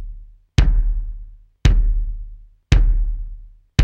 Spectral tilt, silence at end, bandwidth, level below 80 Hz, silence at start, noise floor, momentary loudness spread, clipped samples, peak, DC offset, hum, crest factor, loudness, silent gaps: -6 dB/octave; 0 s; 7.4 kHz; -18 dBFS; 0 s; -38 dBFS; 19 LU; under 0.1%; 0 dBFS; under 0.1%; none; 18 dB; -21 LUFS; none